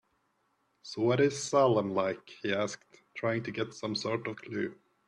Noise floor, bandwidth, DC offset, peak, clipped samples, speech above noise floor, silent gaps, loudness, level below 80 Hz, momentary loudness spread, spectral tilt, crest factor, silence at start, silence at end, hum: -75 dBFS; 11.5 kHz; under 0.1%; -14 dBFS; under 0.1%; 44 dB; none; -31 LUFS; -72 dBFS; 12 LU; -5 dB/octave; 18 dB; 0.85 s; 0.35 s; none